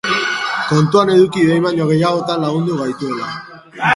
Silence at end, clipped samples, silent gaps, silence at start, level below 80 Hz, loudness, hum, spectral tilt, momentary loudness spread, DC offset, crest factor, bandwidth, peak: 0 s; under 0.1%; none; 0.05 s; -56 dBFS; -15 LUFS; none; -6 dB/octave; 11 LU; under 0.1%; 14 dB; 11.5 kHz; 0 dBFS